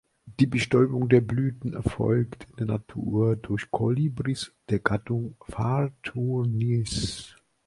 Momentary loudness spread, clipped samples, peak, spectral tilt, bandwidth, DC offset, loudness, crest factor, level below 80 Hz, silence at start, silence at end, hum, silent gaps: 10 LU; under 0.1%; -4 dBFS; -7 dB/octave; 11.5 kHz; under 0.1%; -26 LUFS; 22 dB; -48 dBFS; 0.25 s; 0.35 s; none; none